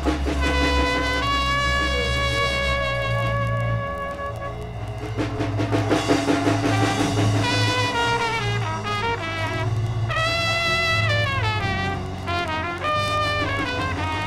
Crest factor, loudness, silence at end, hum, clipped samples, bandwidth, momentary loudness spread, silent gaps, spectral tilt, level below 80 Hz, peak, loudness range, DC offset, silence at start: 18 dB; -22 LUFS; 0 s; none; under 0.1%; 14 kHz; 7 LU; none; -5 dB/octave; -34 dBFS; -6 dBFS; 3 LU; under 0.1%; 0 s